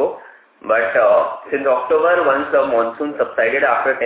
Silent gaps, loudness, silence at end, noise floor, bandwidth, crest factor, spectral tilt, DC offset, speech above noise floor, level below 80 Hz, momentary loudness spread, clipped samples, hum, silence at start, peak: none; -16 LUFS; 0 s; -41 dBFS; 4 kHz; 16 dB; -8 dB/octave; under 0.1%; 25 dB; -60 dBFS; 8 LU; under 0.1%; none; 0 s; -2 dBFS